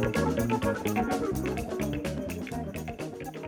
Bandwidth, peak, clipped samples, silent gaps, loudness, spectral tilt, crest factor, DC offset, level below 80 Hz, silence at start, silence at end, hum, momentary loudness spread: 19 kHz; -16 dBFS; under 0.1%; none; -31 LUFS; -6 dB/octave; 14 dB; under 0.1%; -44 dBFS; 0 s; 0 s; none; 9 LU